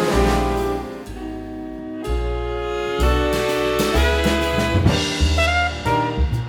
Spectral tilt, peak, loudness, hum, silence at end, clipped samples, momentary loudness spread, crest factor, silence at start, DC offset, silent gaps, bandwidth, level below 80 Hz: -5 dB/octave; -2 dBFS; -20 LUFS; none; 0 s; under 0.1%; 13 LU; 18 dB; 0 s; under 0.1%; none; 18.5 kHz; -26 dBFS